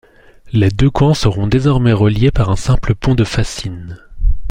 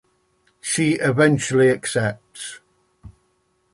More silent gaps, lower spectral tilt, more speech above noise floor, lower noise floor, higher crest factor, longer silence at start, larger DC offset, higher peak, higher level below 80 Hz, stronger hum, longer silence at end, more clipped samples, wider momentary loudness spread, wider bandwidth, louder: neither; first, -7 dB/octave vs -5 dB/octave; second, 27 dB vs 48 dB; second, -40 dBFS vs -66 dBFS; second, 12 dB vs 18 dB; second, 0.45 s vs 0.65 s; neither; first, 0 dBFS vs -4 dBFS; first, -22 dBFS vs -56 dBFS; neither; second, 0 s vs 0.65 s; neither; second, 11 LU vs 17 LU; about the same, 11 kHz vs 11.5 kHz; first, -14 LUFS vs -19 LUFS